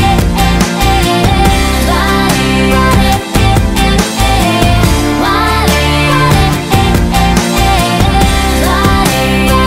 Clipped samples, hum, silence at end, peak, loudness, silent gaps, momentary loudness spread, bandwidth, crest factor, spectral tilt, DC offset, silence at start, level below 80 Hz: under 0.1%; none; 0 s; 0 dBFS; -9 LUFS; none; 2 LU; 16.5 kHz; 8 dB; -5 dB/octave; under 0.1%; 0 s; -16 dBFS